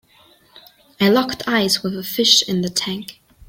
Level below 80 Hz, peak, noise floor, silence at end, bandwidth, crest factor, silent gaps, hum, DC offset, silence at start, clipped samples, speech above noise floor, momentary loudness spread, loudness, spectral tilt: -56 dBFS; 0 dBFS; -53 dBFS; 0.05 s; 16.5 kHz; 20 dB; none; none; under 0.1%; 1 s; under 0.1%; 34 dB; 12 LU; -17 LUFS; -3 dB/octave